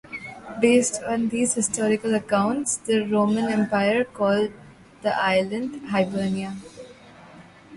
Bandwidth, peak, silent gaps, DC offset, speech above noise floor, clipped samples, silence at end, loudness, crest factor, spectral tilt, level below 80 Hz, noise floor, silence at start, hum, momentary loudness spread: 11.5 kHz; -6 dBFS; none; under 0.1%; 25 dB; under 0.1%; 0 s; -23 LUFS; 18 dB; -4.5 dB/octave; -60 dBFS; -47 dBFS; 0.1 s; none; 12 LU